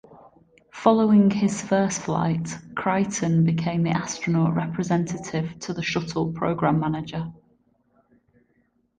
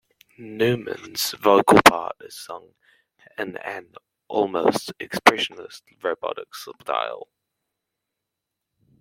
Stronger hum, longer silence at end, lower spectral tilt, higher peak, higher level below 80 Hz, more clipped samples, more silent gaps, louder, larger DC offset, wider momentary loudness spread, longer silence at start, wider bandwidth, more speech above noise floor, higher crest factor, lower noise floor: neither; second, 1.65 s vs 1.8 s; first, -6 dB/octave vs -3.5 dB/octave; second, -4 dBFS vs 0 dBFS; about the same, -56 dBFS vs -58 dBFS; neither; neither; about the same, -23 LUFS vs -21 LUFS; neither; second, 11 LU vs 23 LU; second, 0.1 s vs 0.4 s; second, 9.6 kHz vs 16.5 kHz; second, 44 dB vs 61 dB; about the same, 20 dB vs 24 dB; second, -67 dBFS vs -83 dBFS